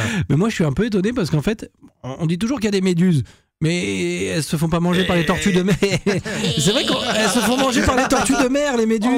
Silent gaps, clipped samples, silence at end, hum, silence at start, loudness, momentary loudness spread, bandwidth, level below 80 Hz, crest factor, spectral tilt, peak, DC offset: none; under 0.1%; 0 s; none; 0 s; -18 LUFS; 5 LU; 16 kHz; -40 dBFS; 10 dB; -5 dB/octave; -8 dBFS; under 0.1%